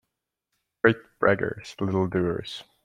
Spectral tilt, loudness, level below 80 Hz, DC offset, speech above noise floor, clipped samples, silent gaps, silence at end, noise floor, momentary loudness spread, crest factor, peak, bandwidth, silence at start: -7 dB/octave; -26 LUFS; -58 dBFS; under 0.1%; 58 dB; under 0.1%; none; 0.25 s; -83 dBFS; 9 LU; 24 dB; -4 dBFS; 11 kHz; 0.85 s